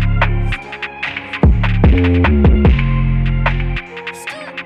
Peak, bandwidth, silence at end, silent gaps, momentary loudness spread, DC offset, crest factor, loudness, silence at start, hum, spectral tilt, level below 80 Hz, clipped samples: 0 dBFS; 10 kHz; 0 s; none; 14 LU; under 0.1%; 14 dB; -15 LUFS; 0 s; none; -8 dB/octave; -18 dBFS; under 0.1%